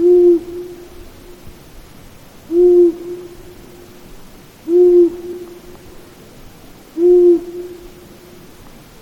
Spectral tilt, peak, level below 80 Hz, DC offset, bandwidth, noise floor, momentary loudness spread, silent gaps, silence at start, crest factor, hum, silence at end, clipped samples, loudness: -7.5 dB/octave; -2 dBFS; -44 dBFS; under 0.1%; 7 kHz; -39 dBFS; 23 LU; none; 0 s; 14 dB; none; 1.3 s; under 0.1%; -12 LUFS